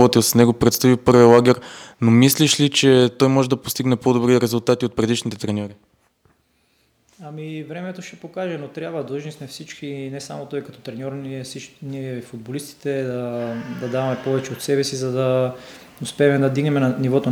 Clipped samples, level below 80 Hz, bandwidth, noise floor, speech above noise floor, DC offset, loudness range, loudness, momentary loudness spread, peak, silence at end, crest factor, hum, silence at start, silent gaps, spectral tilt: under 0.1%; -54 dBFS; 19 kHz; -63 dBFS; 44 dB; under 0.1%; 16 LU; -18 LUFS; 18 LU; 0 dBFS; 0 s; 20 dB; none; 0 s; none; -5 dB/octave